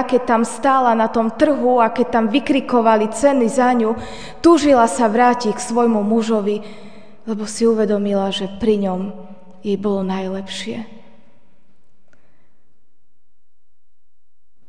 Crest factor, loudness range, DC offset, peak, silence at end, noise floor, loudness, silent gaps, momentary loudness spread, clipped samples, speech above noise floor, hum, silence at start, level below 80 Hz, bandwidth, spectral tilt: 18 dB; 11 LU; 2%; 0 dBFS; 3.75 s; -71 dBFS; -17 LUFS; none; 13 LU; under 0.1%; 55 dB; none; 0 s; -52 dBFS; 10 kHz; -5 dB/octave